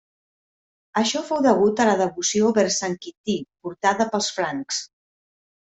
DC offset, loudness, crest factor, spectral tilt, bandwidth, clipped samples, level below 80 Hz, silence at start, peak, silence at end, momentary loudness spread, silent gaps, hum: under 0.1%; -22 LUFS; 20 dB; -3.5 dB/octave; 8.4 kHz; under 0.1%; -64 dBFS; 0.95 s; -4 dBFS; 0.8 s; 10 LU; 3.17-3.24 s; none